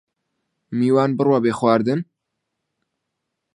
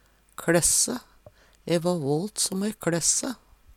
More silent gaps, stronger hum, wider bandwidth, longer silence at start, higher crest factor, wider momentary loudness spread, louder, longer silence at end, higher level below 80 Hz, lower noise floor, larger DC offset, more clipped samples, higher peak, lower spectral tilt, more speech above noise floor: neither; neither; second, 11 kHz vs 17 kHz; first, 0.7 s vs 0.4 s; about the same, 20 dB vs 20 dB; second, 10 LU vs 16 LU; first, -19 LUFS vs -24 LUFS; first, 1.5 s vs 0.4 s; second, -66 dBFS vs -52 dBFS; first, -79 dBFS vs -54 dBFS; neither; neither; first, -2 dBFS vs -8 dBFS; first, -7.5 dB/octave vs -3 dB/octave; first, 61 dB vs 30 dB